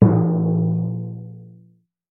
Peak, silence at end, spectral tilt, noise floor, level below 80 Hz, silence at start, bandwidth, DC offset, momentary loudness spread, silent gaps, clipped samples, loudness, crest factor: 0 dBFS; 0.65 s; -15.5 dB/octave; -55 dBFS; -52 dBFS; 0 s; 2.2 kHz; under 0.1%; 21 LU; none; under 0.1%; -20 LUFS; 20 dB